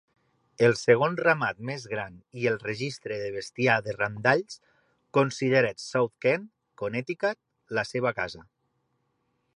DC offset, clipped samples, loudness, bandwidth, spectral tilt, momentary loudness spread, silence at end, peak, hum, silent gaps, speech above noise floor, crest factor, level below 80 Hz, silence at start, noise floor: under 0.1%; under 0.1%; -27 LUFS; 11 kHz; -5.5 dB/octave; 12 LU; 1.15 s; -6 dBFS; none; none; 48 dB; 22 dB; -66 dBFS; 0.6 s; -75 dBFS